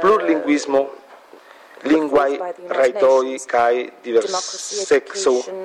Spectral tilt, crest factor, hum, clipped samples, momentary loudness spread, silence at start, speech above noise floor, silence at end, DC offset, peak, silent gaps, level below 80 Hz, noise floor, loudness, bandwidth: -3 dB/octave; 12 dB; none; under 0.1%; 9 LU; 0 s; 26 dB; 0 s; under 0.1%; -6 dBFS; none; -62 dBFS; -45 dBFS; -19 LUFS; 12 kHz